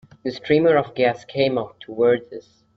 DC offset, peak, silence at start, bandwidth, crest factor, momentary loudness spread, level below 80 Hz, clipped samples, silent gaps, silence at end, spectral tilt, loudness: under 0.1%; -4 dBFS; 0.25 s; 6.4 kHz; 18 dB; 15 LU; -58 dBFS; under 0.1%; none; 0.35 s; -7 dB/octave; -20 LUFS